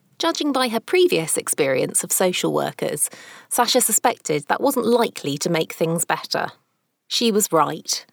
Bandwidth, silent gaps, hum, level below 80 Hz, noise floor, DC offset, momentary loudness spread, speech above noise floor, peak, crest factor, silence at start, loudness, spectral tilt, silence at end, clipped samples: over 20 kHz; none; none; -72 dBFS; -70 dBFS; under 0.1%; 7 LU; 50 dB; -4 dBFS; 18 dB; 0.2 s; -20 LUFS; -3 dB/octave; 0.1 s; under 0.1%